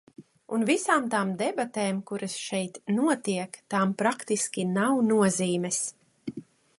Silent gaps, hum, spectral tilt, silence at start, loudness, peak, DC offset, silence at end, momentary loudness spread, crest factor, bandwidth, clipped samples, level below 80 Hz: none; none; -4.5 dB/octave; 0.2 s; -27 LUFS; -8 dBFS; under 0.1%; 0.35 s; 10 LU; 20 dB; 11.5 kHz; under 0.1%; -72 dBFS